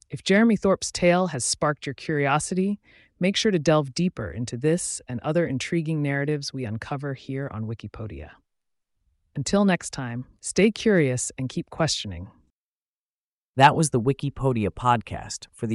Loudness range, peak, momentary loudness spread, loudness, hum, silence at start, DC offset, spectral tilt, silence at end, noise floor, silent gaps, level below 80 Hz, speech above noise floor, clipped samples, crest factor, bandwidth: 6 LU; -4 dBFS; 14 LU; -24 LUFS; none; 0.1 s; under 0.1%; -5 dB/octave; 0 s; under -90 dBFS; 12.50-13.53 s; -52 dBFS; over 66 dB; under 0.1%; 20 dB; 11.5 kHz